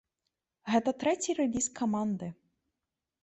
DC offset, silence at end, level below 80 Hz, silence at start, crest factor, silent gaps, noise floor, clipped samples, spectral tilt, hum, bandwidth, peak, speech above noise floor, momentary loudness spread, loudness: under 0.1%; 0.9 s; -66 dBFS; 0.65 s; 18 dB; none; -88 dBFS; under 0.1%; -4.5 dB/octave; none; 8.4 kHz; -14 dBFS; 58 dB; 10 LU; -31 LUFS